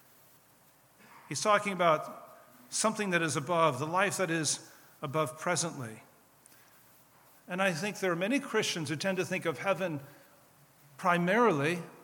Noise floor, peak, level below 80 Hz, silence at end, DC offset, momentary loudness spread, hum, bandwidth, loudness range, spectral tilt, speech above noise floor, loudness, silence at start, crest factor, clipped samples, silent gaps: -63 dBFS; -10 dBFS; -82 dBFS; 0 s; under 0.1%; 10 LU; none; 19 kHz; 5 LU; -4 dB/octave; 32 dB; -30 LUFS; 1.1 s; 22 dB; under 0.1%; none